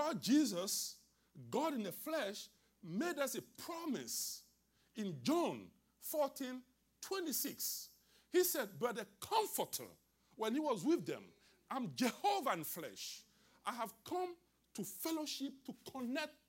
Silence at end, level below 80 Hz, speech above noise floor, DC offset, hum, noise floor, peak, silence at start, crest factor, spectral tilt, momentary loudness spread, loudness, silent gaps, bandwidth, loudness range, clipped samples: 0.15 s; -84 dBFS; 35 dB; under 0.1%; none; -75 dBFS; -24 dBFS; 0 s; 18 dB; -3.5 dB/octave; 15 LU; -40 LUFS; none; 16.5 kHz; 4 LU; under 0.1%